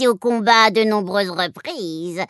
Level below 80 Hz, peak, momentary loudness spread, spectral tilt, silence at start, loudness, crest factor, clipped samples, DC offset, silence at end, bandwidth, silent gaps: -72 dBFS; -2 dBFS; 14 LU; -4 dB/octave; 0 s; -17 LUFS; 16 dB; under 0.1%; under 0.1%; 0.05 s; 12 kHz; none